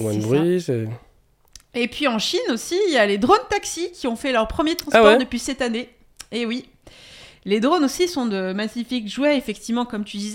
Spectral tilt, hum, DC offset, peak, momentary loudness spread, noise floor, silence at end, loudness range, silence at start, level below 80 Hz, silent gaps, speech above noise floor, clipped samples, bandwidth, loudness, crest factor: -4.5 dB/octave; none; under 0.1%; 0 dBFS; 11 LU; -51 dBFS; 0 s; 5 LU; 0 s; -48 dBFS; none; 31 dB; under 0.1%; 17.5 kHz; -21 LUFS; 22 dB